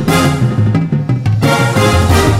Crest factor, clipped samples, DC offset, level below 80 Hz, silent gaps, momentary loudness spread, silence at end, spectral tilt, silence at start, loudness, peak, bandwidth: 10 dB; under 0.1%; under 0.1%; -26 dBFS; none; 4 LU; 0 s; -6 dB/octave; 0 s; -12 LUFS; 0 dBFS; 16.5 kHz